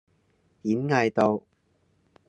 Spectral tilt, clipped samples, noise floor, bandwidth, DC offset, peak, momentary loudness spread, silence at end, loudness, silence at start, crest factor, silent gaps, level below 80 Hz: -7 dB/octave; under 0.1%; -68 dBFS; 10 kHz; under 0.1%; -6 dBFS; 10 LU; 0.9 s; -25 LUFS; 0.65 s; 22 dB; none; -68 dBFS